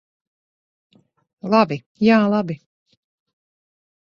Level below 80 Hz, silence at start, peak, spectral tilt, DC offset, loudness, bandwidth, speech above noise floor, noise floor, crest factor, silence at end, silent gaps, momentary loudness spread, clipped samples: -64 dBFS; 1.45 s; -2 dBFS; -7.5 dB/octave; under 0.1%; -18 LUFS; 6.8 kHz; over 72 dB; under -90 dBFS; 20 dB; 1.55 s; 1.86-1.95 s; 17 LU; under 0.1%